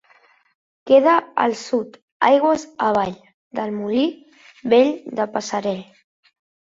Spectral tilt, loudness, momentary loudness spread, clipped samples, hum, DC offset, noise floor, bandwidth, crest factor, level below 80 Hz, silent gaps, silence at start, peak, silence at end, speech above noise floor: -5 dB/octave; -19 LUFS; 12 LU; under 0.1%; none; under 0.1%; -56 dBFS; 7.8 kHz; 18 dB; -64 dBFS; 2.02-2.20 s, 3.34-3.51 s; 0.85 s; -2 dBFS; 0.85 s; 37 dB